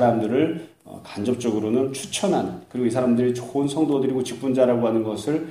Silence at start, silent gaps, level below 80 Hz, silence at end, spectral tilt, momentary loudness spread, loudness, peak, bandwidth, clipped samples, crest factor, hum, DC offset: 0 s; none; -62 dBFS; 0 s; -6 dB/octave; 9 LU; -23 LUFS; -6 dBFS; 15.5 kHz; under 0.1%; 16 dB; none; under 0.1%